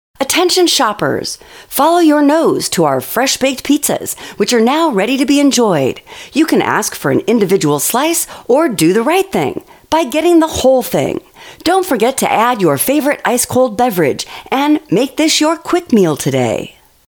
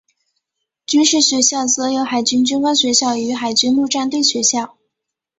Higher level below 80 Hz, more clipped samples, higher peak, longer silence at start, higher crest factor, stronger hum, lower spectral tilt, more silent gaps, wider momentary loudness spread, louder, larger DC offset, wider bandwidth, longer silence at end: first, -50 dBFS vs -62 dBFS; neither; about the same, 0 dBFS vs -2 dBFS; second, 0.2 s vs 0.9 s; about the same, 12 dB vs 16 dB; neither; first, -4 dB/octave vs -1 dB/octave; neither; about the same, 8 LU vs 7 LU; about the same, -13 LUFS vs -15 LUFS; neither; first, over 20 kHz vs 8.4 kHz; second, 0.4 s vs 0.7 s